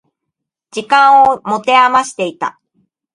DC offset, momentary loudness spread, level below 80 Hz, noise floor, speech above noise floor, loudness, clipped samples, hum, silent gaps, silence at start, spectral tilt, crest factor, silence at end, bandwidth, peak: under 0.1%; 15 LU; -58 dBFS; -78 dBFS; 66 dB; -11 LUFS; under 0.1%; none; none; 0.75 s; -3 dB/octave; 14 dB; 0.65 s; 11.5 kHz; 0 dBFS